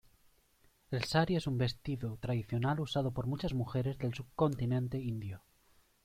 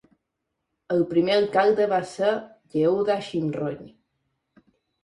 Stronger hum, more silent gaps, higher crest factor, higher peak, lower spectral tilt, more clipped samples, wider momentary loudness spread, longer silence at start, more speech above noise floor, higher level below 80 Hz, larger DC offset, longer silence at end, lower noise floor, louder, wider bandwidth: neither; neither; about the same, 20 dB vs 18 dB; second, -16 dBFS vs -6 dBFS; about the same, -7 dB/octave vs -6.5 dB/octave; neither; second, 8 LU vs 11 LU; about the same, 0.9 s vs 0.9 s; second, 35 dB vs 58 dB; first, -56 dBFS vs -66 dBFS; neither; second, 0.65 s vs 1.15 s; second, -69 dBFS vs -80 dBFS; second, -35 LUFS vs -24 LUFS; first, 15 kHz vs 11 kHz